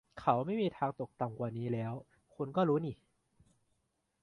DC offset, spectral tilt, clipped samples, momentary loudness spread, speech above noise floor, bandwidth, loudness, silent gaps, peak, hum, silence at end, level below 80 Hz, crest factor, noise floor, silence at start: under 0.1%; -9 dB/octave; under 0.1%; 12 LU; 46 dB; 10.5 kHz; -36 LUFS; none; -12 dBFS; none; 1.3 s; -70 dBFS; 24 dB; -81 dBFS; 0.15 s